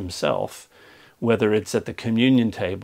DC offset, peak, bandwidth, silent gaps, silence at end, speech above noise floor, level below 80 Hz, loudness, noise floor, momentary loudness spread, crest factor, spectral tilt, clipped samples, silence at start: under 0.1%; -4 dBFS; 15.5 kHz; none; 0 s; 29 dB; -56 dBFS; -22 LUFS; -51 dBFS; 10 LU; 18 dB; -6 dB/octave; under 0.1%; 0 s